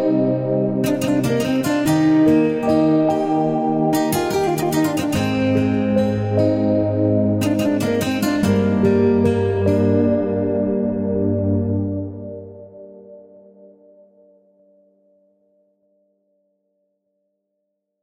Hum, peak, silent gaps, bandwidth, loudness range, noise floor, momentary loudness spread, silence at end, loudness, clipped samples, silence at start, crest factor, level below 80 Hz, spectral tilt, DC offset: none; -4 dBFS; none; 16.5 kHz; 7 LU; -75 dBFS; 5 LU; 4.8 s; -18 LUFS; under 0.1%; 0 s; 14 dB; -50 dBFS; -7 dB/octave; under 0.1%